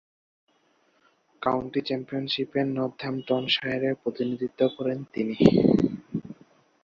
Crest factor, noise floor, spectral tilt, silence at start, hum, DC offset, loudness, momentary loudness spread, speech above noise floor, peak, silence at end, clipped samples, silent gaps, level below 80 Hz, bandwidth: 24 dB; -66 dBFS; -7.5 dB/octave; 1.4 s; none; under 0.1%; -26 LUFS; 10 LU; 41 dB; -2 dBFS; 0.5 s; under 0.1%; none; -56 dBFS; 7.4 kHz